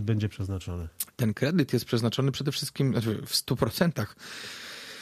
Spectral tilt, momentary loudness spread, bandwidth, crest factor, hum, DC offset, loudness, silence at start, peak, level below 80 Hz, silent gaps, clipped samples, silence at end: -5.5 dB/octave; 12 LU; 15.5 kHz; 18 dB; none; under 0.1%; -29 LUFS; 0 s; -10 dBFS; -54 dBFS; none; under 0.1%; 0 s